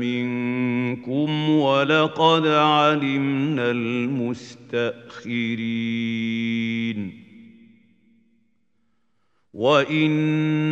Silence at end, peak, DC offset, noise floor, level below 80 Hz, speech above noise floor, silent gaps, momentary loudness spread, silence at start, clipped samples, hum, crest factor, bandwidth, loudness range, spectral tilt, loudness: 0 s; -4 dBFS; under 0.1%; -72 dBFS; -70 dBFS; 51 dB; none; 11 LU; 0 s; under 0.1%; none; 18 dB; 7.8 kHz; 9 LU; -6.5 dB/octave; -22 LUFS